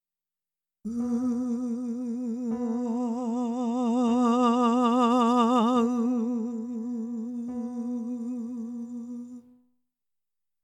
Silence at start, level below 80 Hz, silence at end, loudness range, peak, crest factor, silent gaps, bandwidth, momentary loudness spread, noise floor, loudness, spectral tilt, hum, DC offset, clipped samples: 0.85 s; -72 dBFS; 1.25 s; 11 LU; -10 dBFS; 18 dB; none; 8.8 kHz; 14 LU; under -90 dBFS; -27 LUFS; -6 dB/octave; none; under 0.1%; under 0.1%